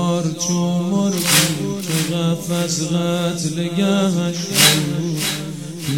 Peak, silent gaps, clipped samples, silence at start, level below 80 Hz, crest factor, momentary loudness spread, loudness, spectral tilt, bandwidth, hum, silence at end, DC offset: 0 dBFS; none; under 0.1%; 0 s; -54 dBFS; 18 dB; 9 LU; -18 LUFS; -4 dB/octave; 17 kHz; none; 0 s; 0.3%